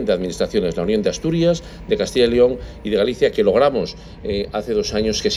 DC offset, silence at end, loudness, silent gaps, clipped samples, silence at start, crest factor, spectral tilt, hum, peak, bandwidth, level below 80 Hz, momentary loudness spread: under 0.1%; 0 s; -19 LUFS; none; under 0.1%; 0 s; 16 dB; -5 dB/octave; none; -2 dBFS; 12.5 kHz; -38 dBFS; 9 LU